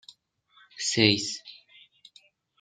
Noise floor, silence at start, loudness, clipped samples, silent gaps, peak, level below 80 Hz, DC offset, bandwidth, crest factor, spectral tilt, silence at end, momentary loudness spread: -63 dBFS; 0.75 s; -24 LUFS; under 0.1%; none; -4 dBFS; -70 dBFS; under 0.1%; 9.6 kHz; 28 dB; -3 dB/octave; 1.05 s; 18 LU